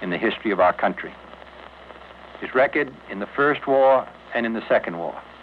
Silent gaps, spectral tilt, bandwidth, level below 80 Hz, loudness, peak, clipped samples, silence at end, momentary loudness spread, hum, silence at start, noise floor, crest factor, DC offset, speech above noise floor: none; -7.5 dB/octave; 5.4 kHz; -58 dBFS; -22 LUFS; -8 dBFS; under 0.1%; 0 s; 24 LU; none; 0 s; -43 dBFS; 16 dB; under 0.1%; 21 dB